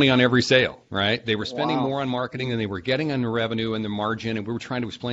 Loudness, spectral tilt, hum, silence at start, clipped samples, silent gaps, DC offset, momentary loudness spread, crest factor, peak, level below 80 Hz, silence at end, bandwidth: -24 LUFS; -5.5 dB/octave; none; 0 s; under 0.1%; none; under 0.1%; 10 LU; 20 dB; -4 dBFS; -56 dBFS; 0 s; 8 kHz